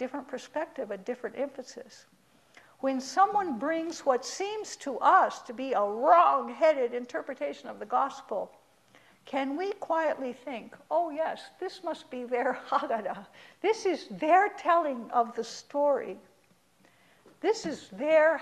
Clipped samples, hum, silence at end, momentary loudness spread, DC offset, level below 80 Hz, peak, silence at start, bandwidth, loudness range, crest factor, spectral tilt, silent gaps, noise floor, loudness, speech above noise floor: under 0.1%; none; 0 s; 15 LU; under 0.1%; -78 dBFS; -8 dBFS; 0 s; 12.5 kHz; 7 LU; 20 dB; -3.5 dB/octave; none; -65 dBFS; -29 LUFS; 36 dB